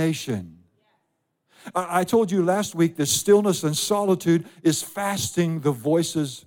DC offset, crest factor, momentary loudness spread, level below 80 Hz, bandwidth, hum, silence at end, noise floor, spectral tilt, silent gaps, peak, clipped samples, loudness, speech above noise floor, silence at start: under 0.1%; 16 dB; 8 LU; -66 dBFS; 17 kHz; none; 0.05 s; -74 dBFS; -4.5 dB/octave; none; -6 dBFS; under 0.1%; -22 LUFS; 52 dB; 0 s